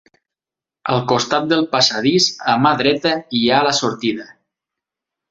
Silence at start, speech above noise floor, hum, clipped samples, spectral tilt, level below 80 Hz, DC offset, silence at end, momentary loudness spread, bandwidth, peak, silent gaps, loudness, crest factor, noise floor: 0.85 s; 72 dB; none; under 0.1%; -4 dB/octave; -58 dBFS; under 0.1%; 1.05 s; 7 LU; 8.2 kHz; 0 dBFS; none; -16 LUFS; 18 dB; -89 dBFS